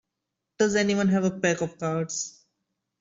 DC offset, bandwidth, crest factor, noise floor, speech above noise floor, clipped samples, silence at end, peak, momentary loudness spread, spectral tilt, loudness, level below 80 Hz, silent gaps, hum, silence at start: under 0.1%; 7.8 kHz; 18 dB; -84 dBFS; 59 dB; under 0.1%; 0.7 s; -8 dBFS; 8 LU; -5 dB/octave; -25 LUFS; -62 dBFS; none; none; 0.6 s